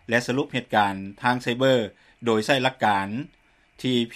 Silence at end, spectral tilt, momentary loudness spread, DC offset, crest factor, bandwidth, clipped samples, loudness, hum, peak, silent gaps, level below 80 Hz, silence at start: 0 s; -5 dB/octave; 10 LU; under 0.1%; 20 dB; 14.5 kHz; under 0.1%; -24 LUFS; none; -4 dBFS; none; -62 dBFS; 0.1 s